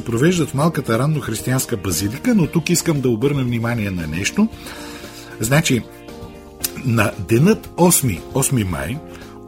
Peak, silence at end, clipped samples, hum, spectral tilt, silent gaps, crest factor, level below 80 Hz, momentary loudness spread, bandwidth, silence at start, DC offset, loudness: -2 dBFS; 0 s; under 0.1%; none; -5 dB/octave; none; 18 dB; -42 dBFS; 17 LU; 16.5 kHz; 0 s; under 0.1%; -18 LUFS